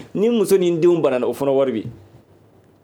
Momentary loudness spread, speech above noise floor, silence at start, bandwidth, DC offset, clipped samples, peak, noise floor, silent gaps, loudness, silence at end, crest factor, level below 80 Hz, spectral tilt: 7 LU; 34 dB; 0 s; 17.5 kHz; under 0.1%; under 0.1%; -6 dBFS; -52 dBFS; none; -18 LUFS; 0.9 s; 14 dB; -62 dBFS; -6.5 dB/octave